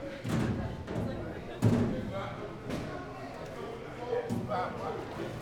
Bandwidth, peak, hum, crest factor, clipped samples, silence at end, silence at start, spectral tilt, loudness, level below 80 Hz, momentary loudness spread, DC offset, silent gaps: 16.5 kHz; -14 dBFS; none; 20 dB; under 0.1%; 0 s; 0 s; -7 dB/octave; -35 LUFS; -52 dBFS; 11 LU; under 0.1%; none